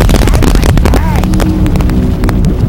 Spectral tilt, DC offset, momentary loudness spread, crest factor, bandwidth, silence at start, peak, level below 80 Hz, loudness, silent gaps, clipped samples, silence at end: -6.5 dB/octave; under 0.1%; 3 LU; 8 dB; 16.5 kHz; 0 s; 0 dBFS; -10 dBFS; -10 LUFS; none; 0.5%; 0 s